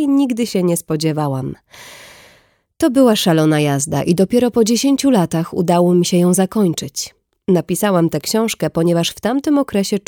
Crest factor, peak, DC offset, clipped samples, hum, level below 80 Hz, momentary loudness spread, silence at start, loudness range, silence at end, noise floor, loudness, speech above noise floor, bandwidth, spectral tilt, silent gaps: 14 dB; -2 dBFS; under 0.1%; under 0.1%; none; -52 dBFS; 9 LU; 0 s; 3 LU; 0.1 s; -54 dBFS; -16 LUFS; 38 dB; 18.5 kHz; -5.5 dB/octave; none